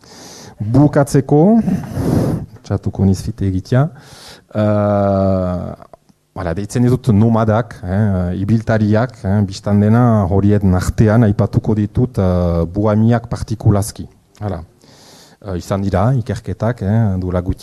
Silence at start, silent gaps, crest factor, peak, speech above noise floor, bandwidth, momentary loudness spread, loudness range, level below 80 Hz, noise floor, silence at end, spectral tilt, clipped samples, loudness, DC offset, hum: 0.1 s; none; 14 dB; 0 dBFS; 29 dB; 13 kHz; 13 LU; 5 LU; -36 dBFS; -43 dBFS; 0 s; -8 dB/octave; under 0.1%; -15 LUFS; under 0.1%; none